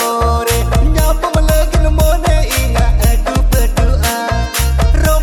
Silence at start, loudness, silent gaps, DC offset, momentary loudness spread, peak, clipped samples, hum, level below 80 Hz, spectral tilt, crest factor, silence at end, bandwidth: 0 s; -14 LUFS; none; under 0.1%; 2 LU; 0 dBFS; under 0.1%; none; -12 dBFS; -5 dB/octave; 10 dB; 0 s; 18 kHz